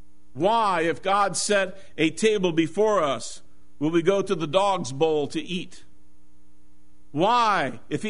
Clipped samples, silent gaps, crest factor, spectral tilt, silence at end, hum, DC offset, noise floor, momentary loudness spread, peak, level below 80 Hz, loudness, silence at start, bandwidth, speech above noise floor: under 0.1%; none; 20 dB; -4.5 dB/octave; 0 s; none; 1%; -59 dBFS; 10 LU; -6 dBFS; -60 dBFS; -23 LUFS; 0.35 s; 11 kHz; 36 dB